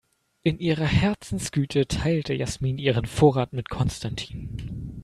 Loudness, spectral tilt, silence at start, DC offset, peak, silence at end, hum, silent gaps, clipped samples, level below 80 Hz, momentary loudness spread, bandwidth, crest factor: -25 LUFS; -6 dB/octave; 0.45 s; under 0.1%; -4 dBFS; 0 s; none; none; under 0.1%; -42 dBFS; 14 LU; 13 kHz; 20 dB